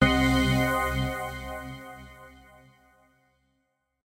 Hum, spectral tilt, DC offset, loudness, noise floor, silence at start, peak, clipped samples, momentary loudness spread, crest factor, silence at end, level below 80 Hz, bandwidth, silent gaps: none; -5.5 dB/octave; under 0.1%; -26 LUFS; -76 dBFS; 0 s; -8 dBFS; under 0.1%; 22 LU; 20 dB; 1.75 s; -40 dBFS; 16 kHz; none